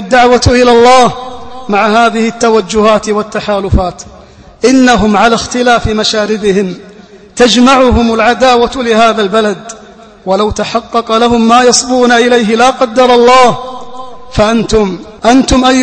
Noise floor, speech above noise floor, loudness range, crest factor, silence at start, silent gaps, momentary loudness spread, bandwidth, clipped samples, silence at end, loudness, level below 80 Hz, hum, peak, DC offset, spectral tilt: -35 dBFS; 27 dB; 3 LU; 8 dB; 0 s; none; 14 LU; 11 kHz; 2%; 0 s; -8 LUFS; -26 dBFS; none; 0 dBFS; under 0.1%; -4 dB/octave